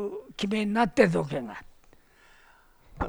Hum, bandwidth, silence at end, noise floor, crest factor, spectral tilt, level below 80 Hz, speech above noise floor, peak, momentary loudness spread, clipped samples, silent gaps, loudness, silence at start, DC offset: none; over 20 kHz; 0 s; -58 dBFS; 22 dB; -6 dB/octave; -50 dBFS; 32 dB; -6 dBFS; 16 LU; under 0.1%; none; -26 LUFS; 0 s; under 0.1%